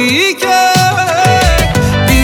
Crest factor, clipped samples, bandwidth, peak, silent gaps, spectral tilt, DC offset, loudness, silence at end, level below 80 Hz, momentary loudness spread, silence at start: 10 dB; under 0.1%; 19.5 kHz; 0 dBFS; none; -4 dB/octave; under 0.1%; -10 LUFS; 0 s; -20 dBFS; 2 LU; 0 s